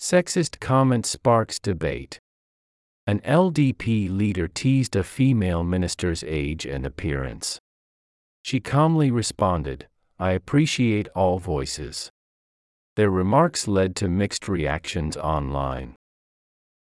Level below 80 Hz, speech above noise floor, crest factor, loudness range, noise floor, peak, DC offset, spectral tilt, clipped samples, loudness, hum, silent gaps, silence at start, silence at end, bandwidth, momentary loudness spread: -42 dBFS; over 68 dB; 18 dB; 3 LU; under -90 dBFS; -6 dBFS; under 0.1%; -5.5 dB/octave; under 0.1%; -23 LUFS; none; 2.19-3.07 s, 7.60-8.44 s, 12.10-12.96 s; 0 s; 0.9 s; 12 kHz; 11 LU